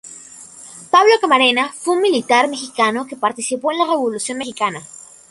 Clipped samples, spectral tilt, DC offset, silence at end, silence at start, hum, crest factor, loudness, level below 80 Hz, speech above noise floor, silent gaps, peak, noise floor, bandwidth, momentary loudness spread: under 0.1%; -2 dB/octave; under 0.1%; 0.45 s; 0.05 s; none; 16 dB; -16 LUFS; -66 dBFS; 22 dB; none; 0 dBFS; -39 dBFS; 11.5 kHz; 23 LU